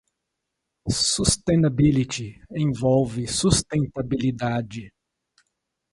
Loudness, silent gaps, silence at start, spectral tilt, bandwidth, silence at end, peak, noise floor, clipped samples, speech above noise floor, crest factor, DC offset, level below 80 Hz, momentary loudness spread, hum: -22 LUFS; none; 0.85 s; -5 dB/octave; 11.5 kHz; 1.05 s; -2 dBFS; -81 dBFS; under 0.1%; 58 dB; 22 dB; under 0.1%; -42 dBFS; 12 LU; none